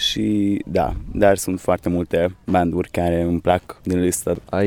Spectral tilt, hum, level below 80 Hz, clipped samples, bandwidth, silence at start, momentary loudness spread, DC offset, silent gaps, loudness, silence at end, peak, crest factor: -5 dB/octave; none; -38 dBFS; under 0.1%; 18 kHz; 0 s; 5 LU; under 0.1%; none; -20 LUFS; 0 s; -2 dBFS; 18 dB